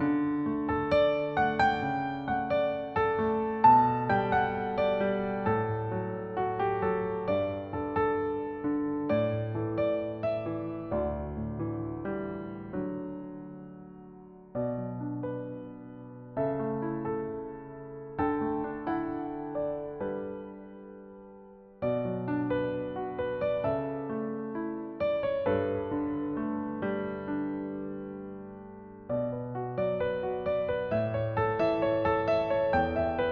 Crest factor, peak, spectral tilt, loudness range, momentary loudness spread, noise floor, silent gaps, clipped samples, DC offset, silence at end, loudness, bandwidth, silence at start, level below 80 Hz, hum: 20 dB; -10 dBFS; -6 dB/octave; 10 LU; 16 LU; -51 dBFS; none; under 0.1%; under 0.1%; 0 s; -31 LUFS; 6.6 kHz; 0 s; -54 dBFS; none